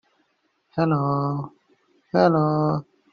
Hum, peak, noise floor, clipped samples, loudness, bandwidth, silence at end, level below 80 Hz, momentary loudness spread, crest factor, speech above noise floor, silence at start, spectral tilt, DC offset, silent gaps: none; -4 dBFS; -69 dBFS; under 0.1%; -23 LUFS; 6.6 kHz; 0.3 s; -60 dBFS; 13 LU; 20 dB; 49 dB; 0.75 s; -7.5 dB/octave; under 0.1%; none